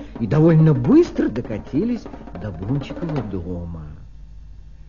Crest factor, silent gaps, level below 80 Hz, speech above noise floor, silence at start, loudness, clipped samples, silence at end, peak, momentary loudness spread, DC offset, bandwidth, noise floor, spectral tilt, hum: 16 dB; none; -40 dBFS; 21 dB; 0 s; -19 LUFS; under 0.1%; 0.15 s; -4 dBFS; 19 LU; 0.5%; 7 kHz; -40 dBFS; -9.5 dB/octave; none